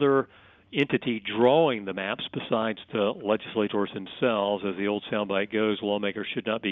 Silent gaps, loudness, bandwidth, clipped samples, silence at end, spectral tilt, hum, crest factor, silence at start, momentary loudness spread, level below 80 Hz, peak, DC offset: none; -27 LUFS; 4.1 kHz; under 0.1%; 0 s; -3.5 dB/octave; none; 18 dB; 0 s; 8 LU; -68 dBFS; -8 dBFS; under 0.1%